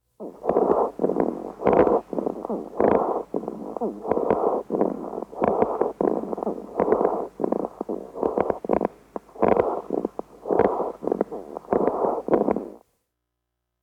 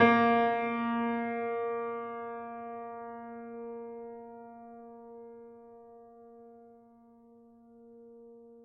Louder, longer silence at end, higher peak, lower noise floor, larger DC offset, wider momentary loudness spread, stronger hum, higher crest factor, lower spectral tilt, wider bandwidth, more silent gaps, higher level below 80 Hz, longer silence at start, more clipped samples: first, -25 LUFS vs -33 LUFS; first, 1.05 s vs 0 s; about the same, -8 dBFS vs -10 dBFS; first, -80 dBFS vs -59 dBFS; neither; second, 10 LU vs 25 LU; neither; second, 18 dB vs 24 dB; first, -9 dB/octave vs -7.5 dB/octave; first, 8.8 kHz vs 5.8 kHz; neither; first, -54 dBFS vs -78 dBFS; first, 0.2 s vs 0 s; neither